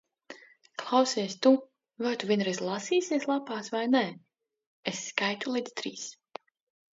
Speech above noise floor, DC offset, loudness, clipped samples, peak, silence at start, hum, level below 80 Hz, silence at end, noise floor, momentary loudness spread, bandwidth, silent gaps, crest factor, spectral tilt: 23 dB; under 0.1%; -29 LUFS; under 0.1%; -8 dBFS; 0.3 s; none; -82 dBFS; 0.8 s; -51 dBFS; 22 LU; 7.8 kHz; 4.67-4.83 s; 22 dB; -4 dB/octave